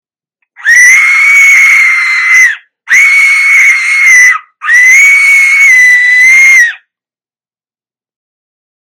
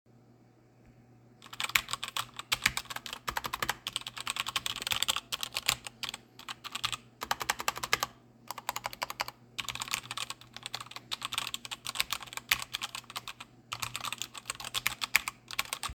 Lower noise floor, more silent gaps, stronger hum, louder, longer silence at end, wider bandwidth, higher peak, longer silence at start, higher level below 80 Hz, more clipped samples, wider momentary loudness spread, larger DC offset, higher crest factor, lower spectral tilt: first, under -90 dBFS vs -61 dBFS; neither; neither; first, -2 LUFS vs -34 LUFS; first, 2.2 s vs 0 s; about the same, over 20 kHz vs 19.5 kHz; first, 0 dBFS vs -4 dBFS; first, 0.6 s vs 0.15 s; first, -54 dBFS vs -62 dBFS; first, 5% vs under 0.1%; second, 6 LU vs 11 LU; neither; second, 6 dB vs 34 dB; second, 4 dB/octave vs 0 dB/octave